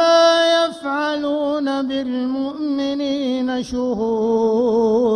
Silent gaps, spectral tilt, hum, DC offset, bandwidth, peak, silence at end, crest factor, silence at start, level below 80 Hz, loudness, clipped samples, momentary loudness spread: none; -4.5 dB/octave; none; under 0.1%; 10.5 kHz; -4 dBFS; 0 s; 14 dB; 0 s; -52 dBFS; -19 LUFS; under 0.1%; 8 LU